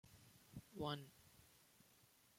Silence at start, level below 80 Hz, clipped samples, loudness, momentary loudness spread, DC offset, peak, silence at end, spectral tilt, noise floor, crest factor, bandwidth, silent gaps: 0.05 s; -78 dBFS; under 0.1%; -52 LUFS; 21 LU; under 0.1%; -32 dBFS; 0.35 s; -5 dB/octave; -73 dBFS; 24 dB; 16.5 kHz; none